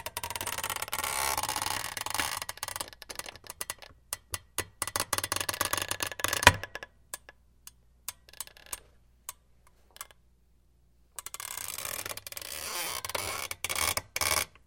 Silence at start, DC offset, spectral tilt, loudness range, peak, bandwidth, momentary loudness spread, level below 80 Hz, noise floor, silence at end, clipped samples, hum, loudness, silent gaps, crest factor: 0 s; under 0.1%; -1 dB/octave; 16 LU; -2 dBFS; 17 kHz; 16 LU; -56 dBFS; -65 dBFS; 0.2 s; under 0.1%; none; -31 LUFS; none; 34 dB